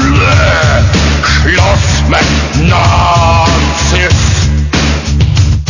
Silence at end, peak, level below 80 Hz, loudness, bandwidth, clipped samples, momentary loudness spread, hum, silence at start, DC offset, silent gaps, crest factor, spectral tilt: 0 s; 0 dBFS; -14 dBFS; -8 LUFS; 7.4 kHz; 0.3%; 4 LU; none; 0 s; under 0.1%; none; 8 dB; -4.5 dB/octave